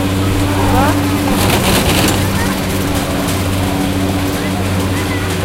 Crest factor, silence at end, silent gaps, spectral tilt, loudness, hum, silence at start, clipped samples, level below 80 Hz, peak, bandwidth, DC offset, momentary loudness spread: 14 dB; 0 s; none; -5 dB/octave; -14 LUFS; none; 0 s; under 0.1%; -26 dBFS; 0 dBFS; 16 kHz; under 0.1%; 5 LU